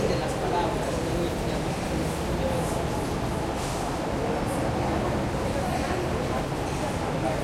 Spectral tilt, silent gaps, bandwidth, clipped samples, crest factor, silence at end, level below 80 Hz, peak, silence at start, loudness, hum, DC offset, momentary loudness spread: -5.5 dB/octave; none; 16.5 kHz; under 0.1%; 16 dB; 0 s; -38 dBFS; -10 dBFS; 0 s; -28 LUFS; none; under 0.1%; 2 LU